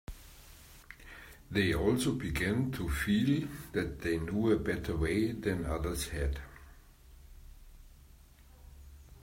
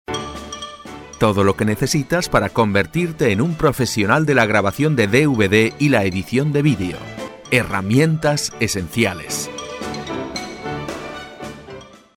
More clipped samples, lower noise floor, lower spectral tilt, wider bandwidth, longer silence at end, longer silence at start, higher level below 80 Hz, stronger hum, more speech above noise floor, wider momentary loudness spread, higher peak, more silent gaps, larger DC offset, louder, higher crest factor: neither; first, -57 dBFS vs -39 dBFS; about the same, -6 dB/octave vs -5 dB/octave; about the same, 16 kHz vs 17 kHz; second, 0.05 s vs 0.2 s; about the same, 0.1 s vs 0.1 s; about the same, -46 dBFS vs -44 dBFS; neither; about the same, 25 dB vs 22 dB; first, 23 LU vs 17 LU; second, -16 dBFS vs -2 dBFS; neither; neither; second, -33 LUFS vs -18 LUFS; about the same, 18 dB vs 16 dB